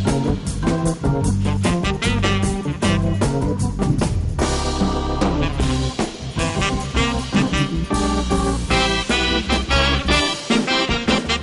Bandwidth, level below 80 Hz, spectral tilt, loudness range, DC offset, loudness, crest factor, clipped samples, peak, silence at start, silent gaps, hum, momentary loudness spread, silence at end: 11.5 kHz; -26 dBFS; -5 dB/octave; 3 LU; under 0.1%; -20 LUFS; 16 dB; under 0.1%; -2 dBFS; 0 s; none; none; 4 LU; 0 s